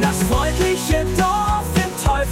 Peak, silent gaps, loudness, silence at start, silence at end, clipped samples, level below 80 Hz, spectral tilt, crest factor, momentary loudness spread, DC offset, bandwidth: -6 dBFS; none; -19 LUFS; 0 s; 0 s; under 0.1%; -26 dBFS; -5 dB/octave; 12 dB; 2 LU; under 0.1%; 16.5 kHz